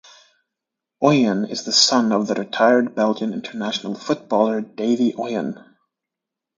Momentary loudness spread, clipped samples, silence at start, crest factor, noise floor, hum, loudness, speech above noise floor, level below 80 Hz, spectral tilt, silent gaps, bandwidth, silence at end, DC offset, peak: 11 LU; under 0.1%; 1 s; 20 dB; -85 dBFS; none; -19 LUFS; 66 dB; -70 dBFS; -4 dB/octave; none; 9.4 kHz; 1.05 s; under 0.1%; -2 dBFS